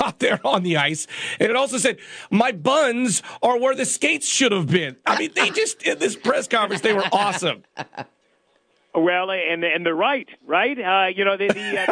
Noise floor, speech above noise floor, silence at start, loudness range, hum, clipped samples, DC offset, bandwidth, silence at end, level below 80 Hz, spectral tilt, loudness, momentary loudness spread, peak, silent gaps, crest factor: -63 dBFS; 43 dB; 0 s; 3 LU; none; under 0.1%; under 0.1%; 10 kHz; 0 s; -70 dBFS; -3 dB/octave; -20 LUFS; 6 LU; -4 dBFS; none; 16 dB